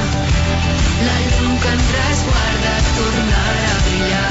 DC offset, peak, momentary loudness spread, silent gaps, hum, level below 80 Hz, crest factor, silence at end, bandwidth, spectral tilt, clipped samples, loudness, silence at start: under 0.1%; -4 dBFS; 1 LU; none; none; -20 dBFS; 10 dB; 0 s; 8 kHz; -4.5 dB/octave; under 0.1%; -16 LUFS; 0 s